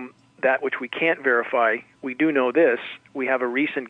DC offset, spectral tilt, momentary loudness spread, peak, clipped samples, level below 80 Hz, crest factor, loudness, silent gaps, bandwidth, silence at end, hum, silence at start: under 0.1%; -6.5 dB/octave; 9 LU; -8 dBFS; under 0.1%; -78 dBFS; 16 dB; -22 LUFS; none; 4.9 kHz; 0 s; none; 0 s